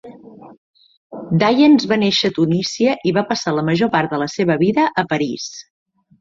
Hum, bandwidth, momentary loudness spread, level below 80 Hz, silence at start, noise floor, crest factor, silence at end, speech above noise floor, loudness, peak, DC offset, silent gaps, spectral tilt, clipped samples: none; 7.6 kHz; 12 LU; -58 dBFS; 0.05 s; -39 dBFS; 16 dB; 0.6 s; 23 dB; -17 LUFS; 0 dBFS; under 0.1%; 0.58-0.74 s, 0.97-1.10 s; -5.5 dB/octave; under 0.1%